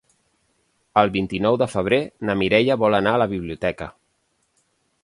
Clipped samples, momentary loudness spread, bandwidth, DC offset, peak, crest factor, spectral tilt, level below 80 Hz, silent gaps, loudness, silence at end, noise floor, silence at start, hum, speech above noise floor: under 0.1%; 8 LU; 11.5 kHz; under 0.1%; 0 dBFS; 22 dB; -6.5 dB/octave; -50 dBFS; none; -20 LUFS; 1.15 s; -69 dBFS; 0.95 s; none; 49 dB